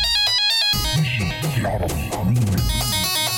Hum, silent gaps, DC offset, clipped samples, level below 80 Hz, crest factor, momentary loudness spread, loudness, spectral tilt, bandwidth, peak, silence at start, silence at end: none; none; under 0.1%; under 0.1%; -32 dBFS; 10 dB; 7 LU; -19 LUFS; -3.5 dB/octave; 17.5 kHz; -10 dBFS; 0 s; 0 s